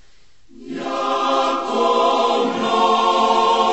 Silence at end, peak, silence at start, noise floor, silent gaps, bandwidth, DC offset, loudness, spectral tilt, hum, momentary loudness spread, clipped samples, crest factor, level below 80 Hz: 0 s; -4 dBFS; 0.6 s; -55 dBFS; none; 8.4 kHz; 0.6%; -17 LUFS; -3 dB/octave; none; 8 LU; under 0.1%; 14 dB; -58 dBFS